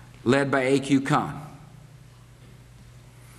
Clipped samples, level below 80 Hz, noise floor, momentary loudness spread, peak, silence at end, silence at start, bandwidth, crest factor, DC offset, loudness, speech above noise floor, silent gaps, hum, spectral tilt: under 0.1%; -56 dBFS; -49 dBFS; 16 LU; -6 dBFS; 0.4 s; 0.05 s; 13 kHz; 22 dB; under 0.1%; -23 LUFS; 27 dB; none; none; -6 dB/octave